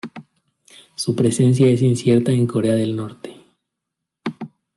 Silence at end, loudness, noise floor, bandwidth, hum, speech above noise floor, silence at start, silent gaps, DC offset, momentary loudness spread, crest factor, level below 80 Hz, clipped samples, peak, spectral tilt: 0.3 s; -18 LUFS; -81 dBFS; 12 kHz; none; 65 dB; 0.05 s; none; under 0.1%; 22 LU; 16 dB; -60 dBFS; under 0.1%; -4 dBFS; -7 dB/octave